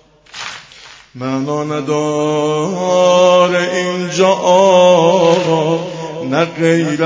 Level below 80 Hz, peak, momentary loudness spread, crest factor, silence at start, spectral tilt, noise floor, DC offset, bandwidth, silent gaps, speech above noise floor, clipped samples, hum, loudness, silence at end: -58 dBFS; 0 dBFS; 16 LU; 14 dB; 0.35 s; -5 dB/octave; -39 dBFS; under 0.1%; 8 kHz; none; 27 dB; under 0.1%; none; -13 LUFS; 0 s